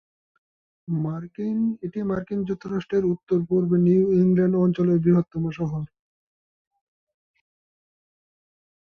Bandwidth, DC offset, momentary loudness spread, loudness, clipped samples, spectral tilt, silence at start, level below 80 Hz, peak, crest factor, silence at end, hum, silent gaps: 6 kHz; under 0.1%; 10 LU; -23 LUFS; under 0.1%; -10.5 dB/octave; 0.9 s; -58 dBFS; -10 dBFS; 16 dB; 3.05 s; none; none